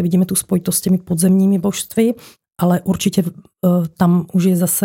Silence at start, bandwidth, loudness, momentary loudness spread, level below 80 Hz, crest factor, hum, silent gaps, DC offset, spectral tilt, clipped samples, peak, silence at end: 0 s; 17 kHz; -16 LUFS; 6 LU; -54 dBFS; 14 dB; none; none; under 0.1%; -6 dB/octave; under 0.1%; -2 dBFS; 0 s